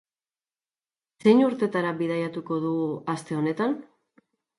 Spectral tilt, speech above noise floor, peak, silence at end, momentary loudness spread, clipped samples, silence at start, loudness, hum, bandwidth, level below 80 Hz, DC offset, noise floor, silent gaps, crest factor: -7 dB/octave; over 66 dB; -6 dBFS; 0.75 s; 10 LU; under 0.1%; 1.25 s; -25 LUFS; none; 11.5 kHz; -74 dBFS; under 0.1%; under -90 dBFS; none; 20 dB